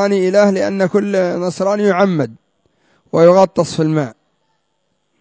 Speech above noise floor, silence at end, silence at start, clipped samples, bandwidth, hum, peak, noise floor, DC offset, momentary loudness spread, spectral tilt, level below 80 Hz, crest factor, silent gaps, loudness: 54 dB; 1.1 s; 0 s; under 0.1%; 8 kHz; none; 0 dBFS; -68 dBFS; under 0.1%; 10 LU; -6.5 dB/octave; -58 dBFS; 14 dB; none; -14 LUFS